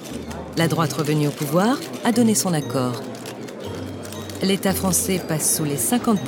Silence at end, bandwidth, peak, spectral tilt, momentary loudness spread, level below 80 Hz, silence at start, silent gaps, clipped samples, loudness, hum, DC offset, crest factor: 0 s; 18 kHz; -4 dBFS; -4.5 dB/octave; 13 LU; -50 dBFS; 0 s; none; under 0.1%; -21 LUFS; none; under 0.1%; 18 dB